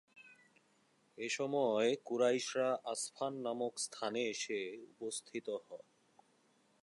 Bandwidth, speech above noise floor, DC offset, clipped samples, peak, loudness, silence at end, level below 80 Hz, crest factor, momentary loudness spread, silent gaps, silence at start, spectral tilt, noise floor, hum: 11.5 kHz; 35 dB; under 0.1%; under 0.1%; -20 dBFS; -38 LUFS; 1.05 s; under -90 dBFS; 18 dB; 12 LU; none; 0.15 s; -3 dB/octave; -73 dBFS; none